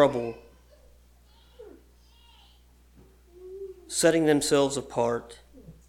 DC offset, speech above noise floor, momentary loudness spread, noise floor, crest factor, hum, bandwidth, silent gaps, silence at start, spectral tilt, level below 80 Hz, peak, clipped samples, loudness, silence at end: under 0.1%; 32 dB; 24 LU; -57 dBFS; 22 dB; 60 Hz at -55 dBFS; 17 kHz; none; 0 s; -4 dB/octave; -56 dBFS; -6 dBFS; under 0.1%; -25 LUFS; 0.15 s